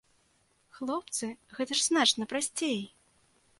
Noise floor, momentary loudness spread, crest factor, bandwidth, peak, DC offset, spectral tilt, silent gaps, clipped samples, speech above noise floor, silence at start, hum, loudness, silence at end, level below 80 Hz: -70 dBFS; 15 LU; 22 dB; 12 kHz; -12 dBFS; under 0.1%; -1.5 dB/octave; none; under 0.1%; 39 dB; 0.75 s; none; -30 LUFS; 0.7 s; -76 dBFS